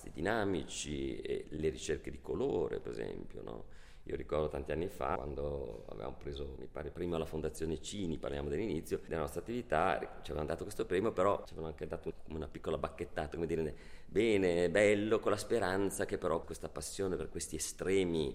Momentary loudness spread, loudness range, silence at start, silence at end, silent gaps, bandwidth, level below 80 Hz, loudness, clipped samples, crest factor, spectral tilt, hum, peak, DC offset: 13 LU; 7 LU; 0 s; 0 s; none; 16 kHz; -52 dBFS; -37 LUFS; under 0.1%; 20 dB; -5 dB/octave; none; -16 dBFS; under 0.1%